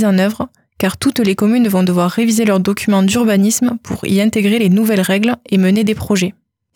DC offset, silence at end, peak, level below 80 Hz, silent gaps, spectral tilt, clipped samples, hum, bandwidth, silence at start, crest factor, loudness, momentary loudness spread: under 0.1%; 0.45 s; -4 dBFS; -48 dBFS; none; -5.5 dB/octave; under 0.1%; none; 18.5 kHz; 0 s; 10 dB; -14 LUFS; 6 LU